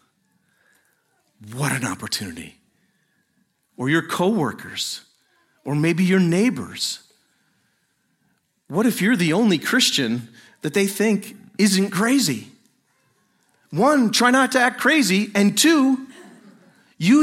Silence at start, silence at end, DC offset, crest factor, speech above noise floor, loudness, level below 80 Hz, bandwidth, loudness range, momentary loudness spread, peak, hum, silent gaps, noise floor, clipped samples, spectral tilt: 1.4 s; 0 s; under 0.1%; 20 dB; 49 dB; -20 LUFS; -68 dBFS; 16.5 kHz; 8 LU; 14 LU; -2 dBFS; none; none; -68 dBFS; under 0.1%; -4 dB/octave